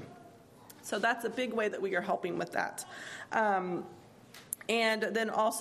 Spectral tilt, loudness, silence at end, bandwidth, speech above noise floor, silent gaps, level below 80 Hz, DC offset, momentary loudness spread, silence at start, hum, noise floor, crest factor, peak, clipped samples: -3.5 dB/octave; -33 LUFS; 0 s; 15 kHz; 23 dB; none; -78 dBFS; under 0.1%; 15 LU; 0 s; none; -55 dBFS; 24 dB; -10 dBFS; under 0.1%